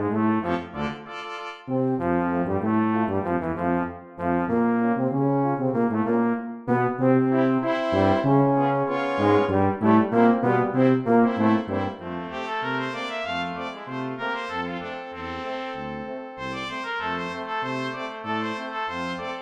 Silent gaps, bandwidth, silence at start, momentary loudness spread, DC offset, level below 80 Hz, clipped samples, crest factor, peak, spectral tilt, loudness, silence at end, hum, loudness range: none; 8.2 kHz; 0 s; 12 LU; under 0.1%; -56 dBFS; under 0.1%; 18 dB; -6 dBFS; -8 dB/octave; -24 LUFS; 0 s; none; 9 LU